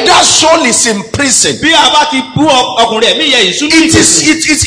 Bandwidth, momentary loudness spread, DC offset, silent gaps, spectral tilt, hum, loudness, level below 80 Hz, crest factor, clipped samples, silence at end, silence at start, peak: 11 kHz; 5 LU; under 0.1%; none; -2 dB/octave; none; -6 LUFS; -36 dBFS; 8 dB; 1%; 0 s; 0 s; 0 dBFS